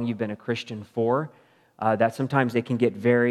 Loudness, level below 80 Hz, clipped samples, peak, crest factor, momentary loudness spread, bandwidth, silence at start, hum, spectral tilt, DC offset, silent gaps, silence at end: -25 LUFS; -76 dBFS; under 0.1%; -4 dBFS; 20 dB; 8 LU; 13 kHz; 0 s; none; -7.5 dB/octave; under 0.1%; none; 0 s